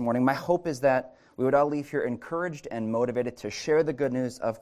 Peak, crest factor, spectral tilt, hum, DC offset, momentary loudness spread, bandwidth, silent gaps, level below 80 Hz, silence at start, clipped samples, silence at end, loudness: -10 dBFS; 18 dB; -6.5 dB/octave; none; under 0.1%; 8 LU; 15 kHz; none; -64 dBFS; 0 s; under 0.1%; 0.05 s; -27 LUFS